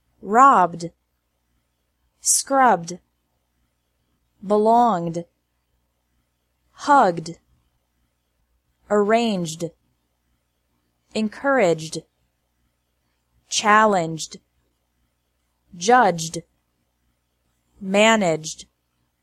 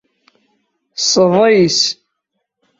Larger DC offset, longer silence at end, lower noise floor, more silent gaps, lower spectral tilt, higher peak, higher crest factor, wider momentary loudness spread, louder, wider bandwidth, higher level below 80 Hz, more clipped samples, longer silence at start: neither; second, 0.6 s vs 0.85 s; about the same, -71 dBFS vs -73 dBFS; neither; about the same, -3.5 dB/octave vs -3.5 dB/octave; about the same, -2 dBFS vs -2 dBFS; first, 20 dB vs 14 dB; first, 19 LU vs 16 LU; second, -19 LUFS vs -12 LUFS; first, 15.5 kHz vs 7.8 kHz; second, -66 dBFS vs -58 dBFS; neither; second, 0.25 s vs 0.95 s